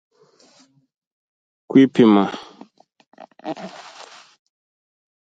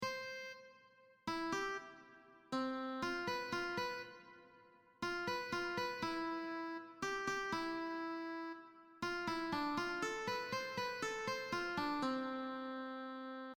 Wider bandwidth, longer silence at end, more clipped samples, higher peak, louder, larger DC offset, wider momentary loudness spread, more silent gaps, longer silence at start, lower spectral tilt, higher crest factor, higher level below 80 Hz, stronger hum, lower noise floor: second, 7.8 kHz vs over 20 kHz; first, 1.55 s vs 0.05 s; neither; first, -2 dBFS vs -28 dBFS; first, -15 LUFS vs -42 LUFS; neither; first, 26 LU vs 10 LU; first, 3.07-3.12 s vs none; first, 1.7 s vs 0 s; first, -7.5 dB/octave vs -4 dB/octave; about the same, 20 dB vs 16 dB; about the same, -68 dBFS vs -72 dBFS; neither; second, -56 dBFS vs -67 dBFS